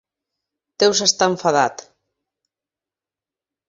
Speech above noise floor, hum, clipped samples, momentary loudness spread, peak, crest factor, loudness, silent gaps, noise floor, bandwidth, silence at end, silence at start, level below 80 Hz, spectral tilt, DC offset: 72 dB; none; under 0.1%; 4 LU; -2 dBFS; 20 dB; -17 LUFS; none; -89 dBFS; 7.8 kHz; 1.85 s; 0.8 s; -64 dBFS; -2 dB/octave; under 0.1%